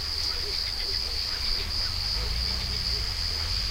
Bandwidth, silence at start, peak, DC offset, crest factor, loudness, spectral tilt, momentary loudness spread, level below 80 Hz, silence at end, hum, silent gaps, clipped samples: 16 kHz; 0 s; -14 dBFS; under 0.1%; 14 dB; -27 LUFS; -2 dB/octave; 1 LU; -34 dBFS; 0 s; none; none; under 0.1%